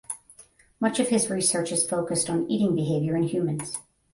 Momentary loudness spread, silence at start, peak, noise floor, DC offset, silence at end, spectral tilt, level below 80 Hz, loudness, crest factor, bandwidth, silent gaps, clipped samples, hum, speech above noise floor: 11 LU; 0.1 s; -10 dBFS; -54 dBFS; under 0.1%; 0.35 s; -4.5 dB/octave; -62 dBFS; -25 LUFS; 16 dB; 11.5 kHz; none; under 0.1%; none; 29 dB